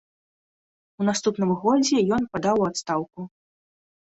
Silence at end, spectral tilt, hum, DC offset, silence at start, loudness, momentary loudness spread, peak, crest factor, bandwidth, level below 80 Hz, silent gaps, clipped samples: 0.85 s; -5 dB/octave; none; under 0.1%; 1 s; -23 LUFS; 12 LU; -8 dBFS; 16 dB; 8.2 kHz; -60 dBFS; none; under 0.1%